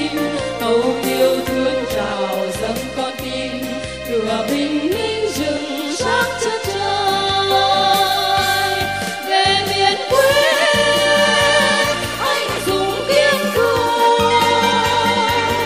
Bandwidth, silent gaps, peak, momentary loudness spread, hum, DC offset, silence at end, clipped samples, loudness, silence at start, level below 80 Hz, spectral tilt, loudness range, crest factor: 16 kHz; none; -2 dBFS; 9 LU; none; 0.3%; 0 s; under 0.1%; -16 LUFS; 0 s; -44 dBFS; -3 dB/octave; 7 LU; 16 dB